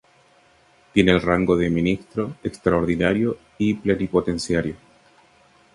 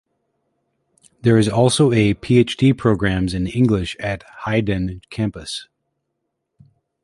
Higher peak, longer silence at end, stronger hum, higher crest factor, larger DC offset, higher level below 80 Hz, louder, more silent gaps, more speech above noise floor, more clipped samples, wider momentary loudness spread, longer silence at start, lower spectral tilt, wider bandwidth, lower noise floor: about the same, -2 dBFS vs -2 dBFS; second, 1 s vs 1.4 s; neither; about the same, 20 dB vs 18 dB; neither; about the same, -44 dBFS vs -40 dBFS; second, -21 LUFS vs -18 LUFS; neither; second, 36 dB vs 58 dB; neither; second, 9 LU vs 12 LU; second, 0.95 s vs 1.25 s; about the same, -6.5 dB/octave vs -6 dB/octave; about the same, 11.5 kHz vs 11.5 kHz; second, -56 dBFS vs -76 dBFS